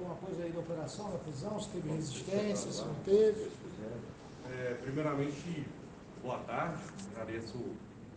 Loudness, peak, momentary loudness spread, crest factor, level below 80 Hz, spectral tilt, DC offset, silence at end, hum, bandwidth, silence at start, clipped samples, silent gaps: -38 LUFS; -18 dBFS; 14 LU; 20 dB; -64 dBFS; -6 dB/octave; under 0.1%; 0 s; none; 9.8 kHz; 0 s; under 0.1%; none